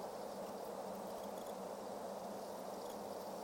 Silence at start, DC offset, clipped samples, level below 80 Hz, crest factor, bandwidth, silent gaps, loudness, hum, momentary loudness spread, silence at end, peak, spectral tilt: 0 s; under 0.1%; under 0.1%; -78 dBFS; 12 dB; 17 kHz; none; -47 LUFS; none; 1 LU; 0 s; -34 dBFS; -4.5 dB/octave